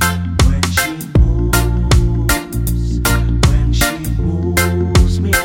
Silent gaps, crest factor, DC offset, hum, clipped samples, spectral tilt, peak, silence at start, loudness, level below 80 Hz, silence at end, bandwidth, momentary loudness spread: none; 14 dB; under 0.1%; none; under 0.1%; -5 dB/octave; 0 dBFS; 0 s; -15 LUFS; -18 dBFS; 0 s; 18.5 kHz; 4 LU